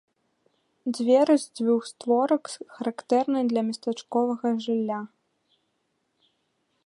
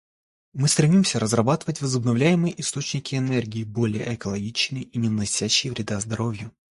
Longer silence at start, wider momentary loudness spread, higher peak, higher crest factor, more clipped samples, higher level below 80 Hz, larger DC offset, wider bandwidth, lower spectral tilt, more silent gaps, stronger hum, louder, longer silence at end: first, 0.85 s vs 0.55 s; first, 12 LU vs 9 LU; second, -8 dBFS vs -4 dBFS; about the same, 18 dB vs 20 dB; neither; second, -82 dBFS vs -54 dBFS; neither; about the same, 11.5 kHz vs 12 kHz; about the same, -5 dB/octave vs -4.5 dB/octave; neither; neither; about the same, -25 LUFS vs -23 LUFS; first, 1.8 s vs 0.25 s